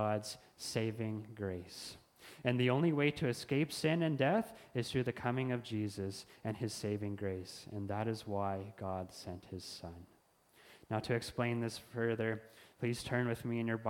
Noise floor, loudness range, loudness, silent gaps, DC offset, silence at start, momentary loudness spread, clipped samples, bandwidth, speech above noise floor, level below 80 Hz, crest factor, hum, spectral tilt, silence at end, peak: -68 dBFS; 8 LU; -38 LUFS; none; under 0.1%; 0 s; 14 LU; under 0.1%; 17 kHz; 31 dB; -68 dBFS; 20 dB; none; -6 dB/octave; 0 s; -16 dBFS